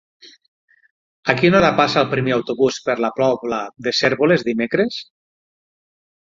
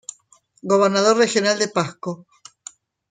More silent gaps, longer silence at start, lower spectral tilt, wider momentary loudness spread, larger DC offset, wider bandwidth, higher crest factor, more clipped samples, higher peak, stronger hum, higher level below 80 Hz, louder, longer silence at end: first, 0.48-0.68 s, 0.91-1.23 s vs none; second, 0.25 s vs 0.65 s; first, -5.5 dB/octave vs -3.5 dB/octave; second, 9 LU vs 23 LU; neither; second, 7.6 kHz vs 9.6 kHz; about the same, 18 dB vs 16 dB; neither; about the same, -2 dBFS vs -4 dBFS; neither; first, -52 dBFS vs -68 dBFS; about the same, -18 LUFS vs -18 LUFS; first, 1.35 s vs 0.95 s